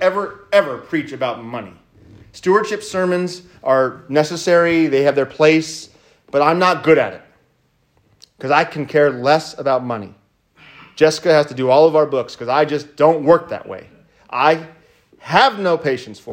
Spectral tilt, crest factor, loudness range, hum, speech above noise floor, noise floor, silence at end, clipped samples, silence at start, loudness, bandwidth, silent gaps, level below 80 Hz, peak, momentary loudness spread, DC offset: -5 dB/octave; 16 dB; 4 LU; none; 45 dB; -61 dBFS; 0 s; under 0.1%; 0 s; -16 LUFS; 15.5 kHz; none; -60 dBFS; 0 dBFS; 13 LU; under 0.1%